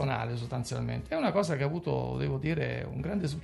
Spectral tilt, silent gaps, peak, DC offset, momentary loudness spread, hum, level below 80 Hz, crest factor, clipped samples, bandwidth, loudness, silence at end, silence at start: -6.5 dB/octave; none; -14 dBFS; under 0.1%; 6 LU; none; -50 dBFS; 18 dB; under 0.1%; 12 kHz; -32 LUFS; 0 s; 0 s